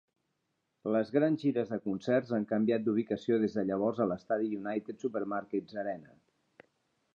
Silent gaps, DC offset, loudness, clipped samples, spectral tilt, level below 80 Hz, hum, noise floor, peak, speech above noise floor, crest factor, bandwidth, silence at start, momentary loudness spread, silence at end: none; under 0.1%; -32 LUFS; under 0.1%; -8 dB/octave; -74 dBFS; none; -81 dBFS; -16 dBFS; 50 dB; 18 dB; 7.2 kHz; 0.85 s; 8 LU; 1.1 s